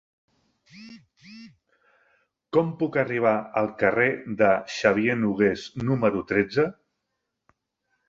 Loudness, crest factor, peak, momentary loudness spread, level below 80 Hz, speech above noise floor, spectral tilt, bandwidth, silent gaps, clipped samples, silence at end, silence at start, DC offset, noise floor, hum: -24 LUFS; 22 dB; -4 dBFS; 6 LU; -60 dBFS; 57 dB; -6.5 dB/octave; 7.6 kHz; none; under 0.1%; 1.35 s; 0.75 s; under 0.1%; -81 dBFS; none